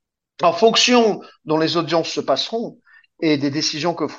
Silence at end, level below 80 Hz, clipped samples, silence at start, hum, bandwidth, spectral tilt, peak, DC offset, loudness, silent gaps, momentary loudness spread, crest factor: 0 s; -68 dBFS; under 0.1%; 0.4 s; none; 8.2 kHz; -3.5 dB/octave; -2 dBFS; under 0.1%; -18 LUFS; none; 11 LU; 18 dB